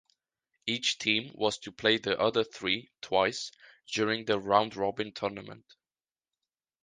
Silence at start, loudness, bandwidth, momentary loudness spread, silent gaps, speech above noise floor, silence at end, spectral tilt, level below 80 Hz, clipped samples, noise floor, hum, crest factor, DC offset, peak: 0.65 s; -30 LUFS; 9.8 kHz; 10 LU; none; over 60 dB; 1.25 s; -3.5 dB/octave; -68 dBFS; under 0.1%; under -90 dBFS; none; 24 dB; under 0.1%; -8 dBFS